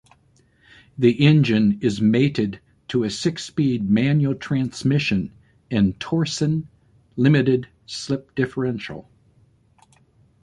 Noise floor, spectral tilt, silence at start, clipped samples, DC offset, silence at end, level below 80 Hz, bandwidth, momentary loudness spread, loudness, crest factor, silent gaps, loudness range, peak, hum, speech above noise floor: -59 dBFS; -6.5 dB/octave; 1 s; under 0.1%; under 0.1%; 1.4 s; -52 dBFS; 11 kHz; 14 LU; -21 LUFS; 18 dB; none; 4 LU; -4 dBFS; none; 39 dB